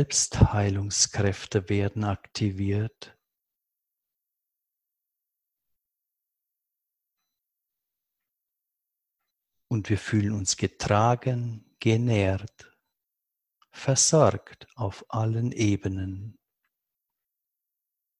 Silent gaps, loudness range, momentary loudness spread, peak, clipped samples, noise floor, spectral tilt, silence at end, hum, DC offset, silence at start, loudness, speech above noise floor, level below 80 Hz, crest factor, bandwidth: none; 9 LU; 13 LU; -4 dBFS; under 0.1%; -85 dBFS; -4.5 dB/octave; 1.85 s; none; under 0.1%; 0 s; -26 LUFS; 60 dB; -46 dBFS; 24 dB; 11.5 kHz